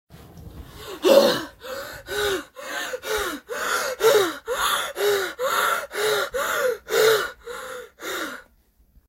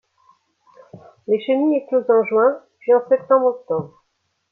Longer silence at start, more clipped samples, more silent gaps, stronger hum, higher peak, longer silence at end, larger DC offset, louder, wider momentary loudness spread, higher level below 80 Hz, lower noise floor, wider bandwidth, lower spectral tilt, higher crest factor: second, 0.1 s vs 0.95 s; neither; neither; neither; first, 0 dBFS vs -4 dBFS; about the same, 0.65 s vs 0.65 s; neither; second, -23 LUFS vs -18 LUFS; first, 16 LU vs 10 LU; first, -52 dBFS vs -72 dBFS; second, -59 dBFS vs -71 dBFS; first, 16 kHz vs 4.1 kHz; second, -2 dB/octave vs -9 dB/octave; first, 24 dB vs 16 dB